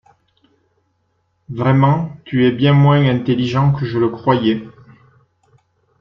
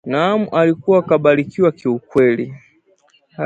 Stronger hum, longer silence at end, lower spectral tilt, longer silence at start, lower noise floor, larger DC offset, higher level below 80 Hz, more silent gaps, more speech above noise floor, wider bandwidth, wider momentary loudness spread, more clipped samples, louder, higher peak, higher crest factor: neither; first, 1.3 s vs 0 s; about the same, -9 dB/octave vs -8 dB/octave; first, 1.5 s vs 0.05 s; first, -65 dBFS vs -57 dBFS; neither; first, -50 dBFS vs -58 dBFS; neither; first, 51 dB vs 41 dB; second, 6.2 kHz vs 7.8 kHz; about the same, 8 LU vs 7 LU; neither; about the same, -15 LUFS vs -16 LUFS; about the same, -2 dBFS vs 0 dBFS; about the same, 16 dB vs 16 dB